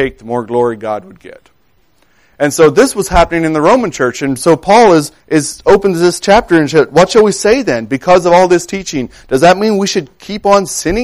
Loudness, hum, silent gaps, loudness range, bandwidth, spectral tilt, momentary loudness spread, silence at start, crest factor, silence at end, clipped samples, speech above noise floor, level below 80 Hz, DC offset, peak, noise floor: -10 LUFS; none; none; 3 LU; 16 kHz; -4.5 dB/octave; 10 LU; 0 s; 10 dB; 0 s; under 0.1%; 45 dB; -32 dBFS; under 0.1%; 0 dBFS; -55 dBFS